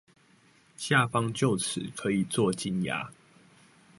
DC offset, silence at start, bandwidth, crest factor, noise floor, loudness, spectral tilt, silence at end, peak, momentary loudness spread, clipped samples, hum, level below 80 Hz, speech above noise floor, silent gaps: under 0.1%; 0.8 s; 12 kHz; 22 dB; -62 dBFS; -28 LUFS; -4.5 dB/octave; 0.85 s; -8 dBFS; 9 LU; under 0.1%; none; -64 dBFS; 34 dB; none